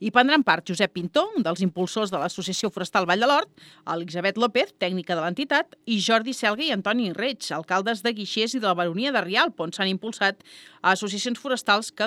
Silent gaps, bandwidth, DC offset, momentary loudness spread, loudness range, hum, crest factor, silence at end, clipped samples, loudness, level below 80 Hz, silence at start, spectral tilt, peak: none; 15.5 kHz; under 0.1%; 7 LU; 1 LU; none; 22 dB; 0 s; under 0.1%; -24 LUFS; -74 dBFS; 0 s; -4 dB/octave; -2 dBFS